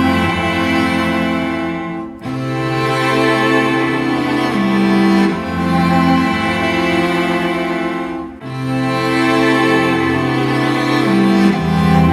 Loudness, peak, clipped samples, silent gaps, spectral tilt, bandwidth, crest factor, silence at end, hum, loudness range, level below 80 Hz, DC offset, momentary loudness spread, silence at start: -15 LUFS; 0 dBFS; under 0.1%; none; -6.5 dB/octave; 14 kHz; 14 dB; 0 s; none; 2 LU; -40 dBFS; under 0.1%; 8 LU; 0 s